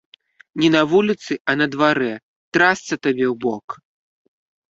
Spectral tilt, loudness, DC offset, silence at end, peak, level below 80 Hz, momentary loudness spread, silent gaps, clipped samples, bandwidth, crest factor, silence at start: -5 dB/octave; -19 LUFS; under 0.1%; 0.95 s; -2 dBFS; -62 dBFS; 16 LU; 1.40-1.45 s, 2.23-2.52 s, 3.64-3.68 s; under 0.1%; 7.8 kHz; 18 dB; 0.55 s